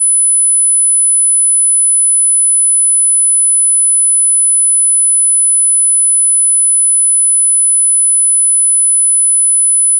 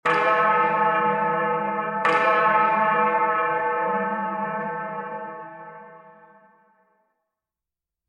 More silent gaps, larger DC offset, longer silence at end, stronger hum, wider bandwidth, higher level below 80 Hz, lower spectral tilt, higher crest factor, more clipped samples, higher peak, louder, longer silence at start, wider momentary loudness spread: neither; neither; second, 0 s vs 2 s; neither; about the same, 10.5 kHz vs 9.8 kHz; second, under -90 dBFS vs -72 dBFS; second, 9.5 dB/octave vs -6 dB/octave; second, 4 dB vs 16 dB; neither; about the same, -6 dBFS vs -8 dBFS; first, -6 LUFS vs -22 LUFS; about the same, 0 s vs 0.05 s; second, 0 LU vs 15 LU